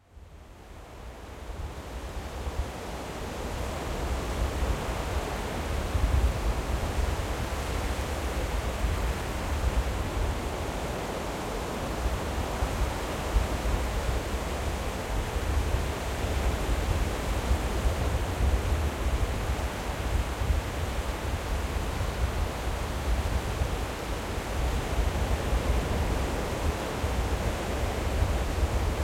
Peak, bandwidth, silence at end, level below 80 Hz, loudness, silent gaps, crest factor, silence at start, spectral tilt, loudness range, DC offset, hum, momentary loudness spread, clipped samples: -12 dBFS; 16.5 kHz; 0 s; -32 dBFS; -31 LUFS; none; 16 dB; 0.15 s; -5 dB/octave; 3 LU; under 0.1%; none; 6 LU; under 0.1%